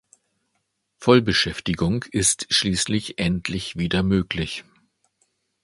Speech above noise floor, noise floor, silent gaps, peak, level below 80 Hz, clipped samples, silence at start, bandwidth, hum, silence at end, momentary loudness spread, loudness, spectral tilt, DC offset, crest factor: 52 dB; -74 dBFS; none; 0 dBFS; -44 dBFS; under 0.1%; 1 s; 11.5 kHz; none; 1.05 s; 9 LU; -21 LUFS; -4 dB/octave; under 0.1%; 24 dB